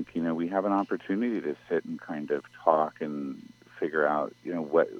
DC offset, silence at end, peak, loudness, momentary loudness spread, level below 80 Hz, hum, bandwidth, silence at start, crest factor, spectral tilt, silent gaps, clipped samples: under 0.1%; 0 s; -6 dBFS; -30 LUFS; 10 LU; -74 dBFS; none; 7 kHz; 0 s; 22 dB; -8 dB/octave; none; under 0.1%